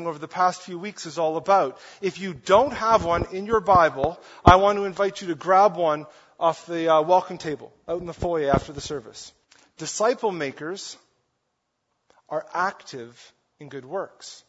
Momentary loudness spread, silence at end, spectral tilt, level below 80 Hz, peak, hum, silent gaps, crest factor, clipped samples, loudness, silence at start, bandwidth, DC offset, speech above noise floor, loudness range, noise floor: 17 LU; 0.1 s; -5 dB/octave; -44 dBFS; 0 dBFS; none; none; 24 dB; under 0.1%; -23 LUFS; 0 s; 8 kHz; under 0.1%; 53 dB; 12 LU; -76 dBFS